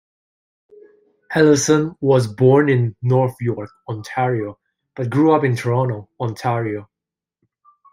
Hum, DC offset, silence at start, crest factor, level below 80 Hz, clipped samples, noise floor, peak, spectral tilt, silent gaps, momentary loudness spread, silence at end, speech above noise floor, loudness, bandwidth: none; under 0.1%; 1.3 s; 16 dB; -60 dBFS; under 0.1%; -87 dBFS; -2 dBFS; -6.5 dB/octave; none; 15 LU; 1.1 s; 69 dB; -18 LUFS; 12.5 kHz